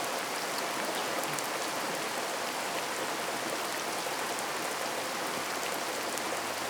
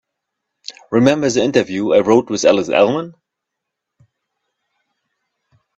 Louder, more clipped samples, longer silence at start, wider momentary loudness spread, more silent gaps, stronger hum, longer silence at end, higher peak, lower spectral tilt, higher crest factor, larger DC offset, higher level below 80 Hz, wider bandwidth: second, -33 LUFS vs -15 LUFS; neither; second, 0 s vs 0.7 s; second, 1 LU vs 20 LU; neither; neither; second, 0 s vs 2.65 s; second, -10 dBFS vs 0 dBFS; second, -1.5 dB/octave vs -5 dB/octave; first, 24 dB vs 18 dB; neither; second, -76 dBFS vs -58 dBFS; first, over 20 kHz vs 8.2 kHz